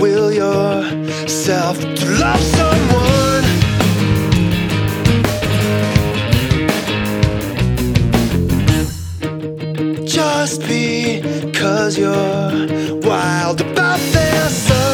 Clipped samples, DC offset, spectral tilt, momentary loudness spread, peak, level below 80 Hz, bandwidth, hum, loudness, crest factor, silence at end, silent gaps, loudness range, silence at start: under 0.1%; under 0.1%; -5 dB/octave; 6 LU; 0 dBFS; -28 dBFS; over 20 kHz; none; -15 LUFS; 14 dB; 0 s; none; 3 LU; 0 s